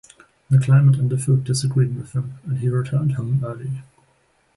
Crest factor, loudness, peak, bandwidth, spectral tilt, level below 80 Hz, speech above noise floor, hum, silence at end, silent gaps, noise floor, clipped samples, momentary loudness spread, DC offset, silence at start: 14 dB; -20 LUFS; -6 dBFS; 11.5 kHz; -7 dB/octave; -54 dBFS; 43 dB; none; 0.75 s; none; -62 dBFS; under 0.1%; 13 LU; under 0.1%; 0.5 s